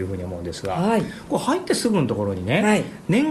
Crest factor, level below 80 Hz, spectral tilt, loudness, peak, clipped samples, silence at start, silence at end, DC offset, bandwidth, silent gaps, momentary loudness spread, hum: 16 dB; -50 dBFS; -5.5 dB/octave; -22 LUFS; -6 dBFS; under 0.1%; 0 s; 0 s; under 0.1%; 13 kHz; none; 9 LU; none